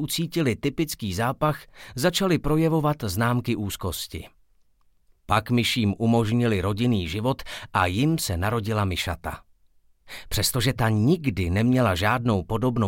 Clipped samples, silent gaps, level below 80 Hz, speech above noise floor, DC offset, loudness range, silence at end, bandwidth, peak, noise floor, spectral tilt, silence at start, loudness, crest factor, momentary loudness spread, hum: under 0.1%; none; -44 dBFS; 37 dB; under 0.1%; 3 LU; 0 s; 17 kHz; -8 dBFS; -61 dBFS; -5.5 dB/octave; 0 s; -24 LUFS; 18 dB; 9 LU; none